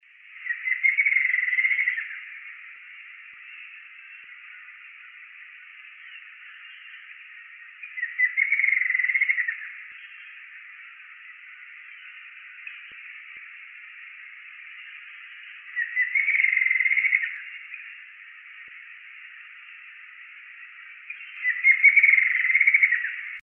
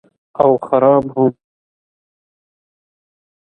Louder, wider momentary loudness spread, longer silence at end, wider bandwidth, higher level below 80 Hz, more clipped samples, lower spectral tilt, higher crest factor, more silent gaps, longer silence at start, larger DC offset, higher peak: second, -20 LUFS vs -14 LUFS; first, 24 LU vs 6 LU; second, 0 s vs 2.1 s; second, 3.5 kHz vs 3.9 kHz; second, under -90 dBFS vs -58 dBFS; neither; second, 1.5 dB/octave vs -10.5 dB/octave; about the same, 22 dB vs 18 dB; neither; about the same, 0.3 s vs 0.4 s; neither; second, -6 dBFS vs 0 dBFS